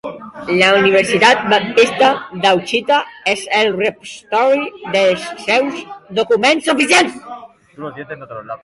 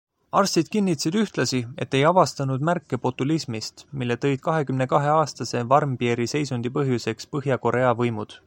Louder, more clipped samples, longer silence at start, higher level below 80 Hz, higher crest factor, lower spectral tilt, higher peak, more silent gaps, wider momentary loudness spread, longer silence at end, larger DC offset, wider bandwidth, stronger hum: first, -14 LUFS vs -23 LUFS; neither; second, 0.05 s vs 0.35 s; about the same, -58 dBFS vs -60 dBFS; about the same, 16 dB vs 20 dB; second, -3.5 dB/octave vs -5.5 dB/octave; first, 0 dBFS vs -4 dBFS; neither; first, 19 LU vs 8 LU; about the same, 0.1 s vs 0.1 s; neither; second, 11.5 kHz vs 16.5 kHz; neither